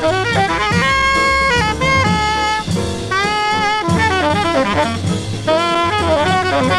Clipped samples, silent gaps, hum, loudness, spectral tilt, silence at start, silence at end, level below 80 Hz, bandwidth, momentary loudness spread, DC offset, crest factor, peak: under 0.1%; none; none; -15 LUFS; -4.5 dB/octave; 0 s; 0 s; -32 dBFS; 13.5 kHz; 5 LU; under 0.1%; 14 dB; -2 dBFS